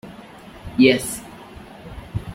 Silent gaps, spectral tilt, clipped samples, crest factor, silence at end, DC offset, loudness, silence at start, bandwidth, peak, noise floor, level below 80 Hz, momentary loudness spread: none; -4.5 dB/octave; under 0.1%; 20 dB; 0 s; under 0.1%; -19 LUFS; 0.05 s; 16.5 kHz; -2 dBFS; -41 dBFS; -44 dBFS; 25 LU